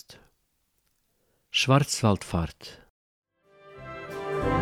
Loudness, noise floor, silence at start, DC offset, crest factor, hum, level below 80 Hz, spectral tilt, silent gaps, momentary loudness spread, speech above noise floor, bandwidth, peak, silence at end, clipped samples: -26 LUFS; -73 dBFS; 0.1 s; under 0.1%; 22 dB; none; -48 dBFS; -5 dB/octave; 2.90-3.22 s; 22 LU; 48 dB; 15.5 kHz; -8 dBFS; 0 s; under 0.1%